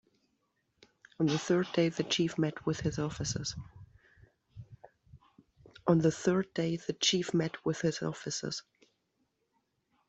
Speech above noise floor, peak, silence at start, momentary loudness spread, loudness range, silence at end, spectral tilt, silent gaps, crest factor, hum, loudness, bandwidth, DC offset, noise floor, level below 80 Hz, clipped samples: 47 dB; -12 dBFS; 1.2 s; 12 LU; 6 LU; 1.5 s; -5 dB/octave; none; 22 dB; none; -32 LUFS; 8.2 kHz; under 0.1%; -79 dBFS; -62 dBFS; under 0.1%